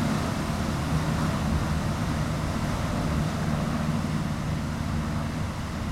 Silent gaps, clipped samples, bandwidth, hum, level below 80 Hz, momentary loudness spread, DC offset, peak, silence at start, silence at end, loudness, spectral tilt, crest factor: none; under 0.1%; 15.5 kHz; none; -36 dBFS; 3 LU; under 0.1%; -14 dBFS; 0 s; 0 s; -28 LUFS; -6 dB/octave; 12 dB